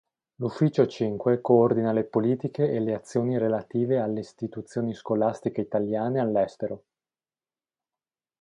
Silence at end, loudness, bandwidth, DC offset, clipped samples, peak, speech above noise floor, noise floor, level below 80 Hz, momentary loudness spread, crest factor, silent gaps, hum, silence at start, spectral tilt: 1.65 s; -26 LUFS; 10.5 kHz; under 0.1%; under 0.1%; -6 dBFS; over 65 dB; under -90 dBFS; -66 dBFS; 11 LU; 20 dB; none; none; 0.4 s; -8.5 dB/octave